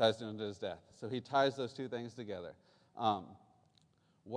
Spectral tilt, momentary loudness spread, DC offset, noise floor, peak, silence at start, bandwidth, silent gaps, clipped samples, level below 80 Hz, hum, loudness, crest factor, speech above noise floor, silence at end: -5.5 dB/octave; 15 LU; under 0.1%; -72 dBFS; -16 dBFS; 0 s; 10 kHz; none; under 0.1%; -80 dBFS; none; -38 LUFS; 22 dB; 34 dB; 0 s